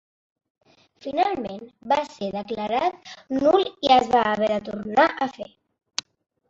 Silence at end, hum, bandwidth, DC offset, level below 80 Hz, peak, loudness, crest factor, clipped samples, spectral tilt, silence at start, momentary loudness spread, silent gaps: 1.05 s; none; 7.8 kHz; under 0.1%; -60 dBFS; -4 dBFS; -23 LUFS; 20 dB; under 0.1%; -4 dB/octave; 1.05 s; 16 LU; none